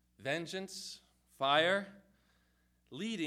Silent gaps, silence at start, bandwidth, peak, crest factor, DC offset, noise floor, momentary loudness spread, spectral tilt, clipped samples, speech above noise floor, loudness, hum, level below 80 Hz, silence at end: none; 0.2 s; 15.5 kHz; -16 dBFS; 22 dB; under 0.1%; -74 dBFS; 22 LU; -3.5 dB/octave; under 0.1%; 39 dB; -35 LUFS; 60 Hz at -70 dBFS; -78 dBFS; 0 s